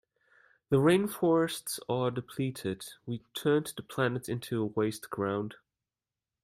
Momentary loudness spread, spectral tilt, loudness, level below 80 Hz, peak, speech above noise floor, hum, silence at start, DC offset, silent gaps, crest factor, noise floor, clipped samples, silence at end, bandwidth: 12 LU; -5.5 dB/octave; -31 LUFS; -70 dBFS; -12 dBFS; over 60 dB; none; 0.7 s; under 0.1%; none; 18 dB; under -90 dBFS; under 0.1%; 0.9 s; 16 kHz